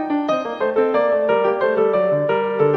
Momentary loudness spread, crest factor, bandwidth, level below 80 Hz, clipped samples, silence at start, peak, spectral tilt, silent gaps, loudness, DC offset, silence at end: 4 LU; 12 dB; 6.2 kHz; -64 dBFS; under 0.1%; 0 s; -6 dBFS; -7.5 dB/octave; none; -18 LUFS; under 0.1%; 0 s